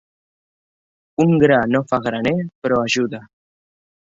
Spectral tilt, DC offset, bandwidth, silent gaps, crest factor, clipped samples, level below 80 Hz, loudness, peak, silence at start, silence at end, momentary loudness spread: -6 dB/octave; under 0.1%; 7.8 kHz; 2.55-2.62 s; 18 dB; under 0.1%; -54 dBFS; -18 LUFS; -2 dBFS; 1.2 s; 0.95 s; 10 LU